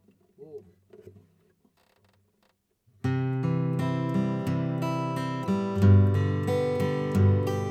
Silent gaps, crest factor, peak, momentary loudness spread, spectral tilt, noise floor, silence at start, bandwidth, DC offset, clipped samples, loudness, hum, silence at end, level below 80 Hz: none; 18 dB; -10 dBFS; 10 LU; -8.5 dB/octave; -71 dBFS; 0.4 s; 9 kHz; under 0.1%; under 0.1%; -26 LUFS; none; 0 s; -62 dBFS